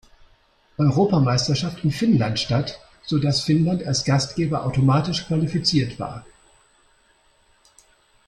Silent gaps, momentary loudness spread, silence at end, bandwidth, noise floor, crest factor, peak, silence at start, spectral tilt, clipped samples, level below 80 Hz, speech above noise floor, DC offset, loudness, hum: none; 10 LU; 2.05 s; 11 kHz; -60 dBFS; 16 dB; -6 dBFS; 0.8 s; -6 dB/octave; under 0.1%; -50 dBFS; 39 dB; under 0.1%; -21 LUFS; none